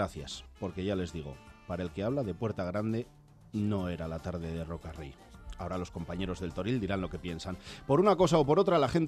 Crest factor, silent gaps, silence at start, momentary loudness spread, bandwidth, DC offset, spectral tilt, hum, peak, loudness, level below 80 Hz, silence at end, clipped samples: 20 dB; none; 0 s; 17 LU; 13 kHz; under 0.1%; -7 dB/octave; none; -12 dBFS; -32 LUFS; -52 dBFS; 0 s; under 0.1%